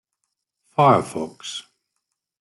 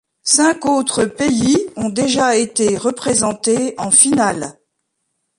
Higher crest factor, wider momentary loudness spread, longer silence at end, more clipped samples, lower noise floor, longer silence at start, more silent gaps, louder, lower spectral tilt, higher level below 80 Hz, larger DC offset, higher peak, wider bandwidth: about the same, 20 dB vs 16 dB; first, 16 LU vs 8 LU; about the same, 0.8 s vs 0.85 s; neither; first, -79 dBFS vs -72 dBFS; first, 0.8 s vs 0.25 s; neither; second, -20 LUFS vs -15 LUFS; first, -5.5 dB/octave vs -3 dB/octave; second, -66 dBFS vs -50 dBFS; neither; second, -4 dBFS vs 0 dBFS; about the same, 12 kHz vs 11.5 kHz